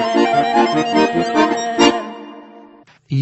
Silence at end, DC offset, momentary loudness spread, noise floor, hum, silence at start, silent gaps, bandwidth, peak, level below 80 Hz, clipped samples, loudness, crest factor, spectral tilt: 0 s; under 0.1%; 15 LU; -45 dBFS; none; 0 s; none; 8.4 kHz; 0 dBFS; -52 dBFS; under 0.1%; -15 LUFS; 16 dB; -5 dB/octave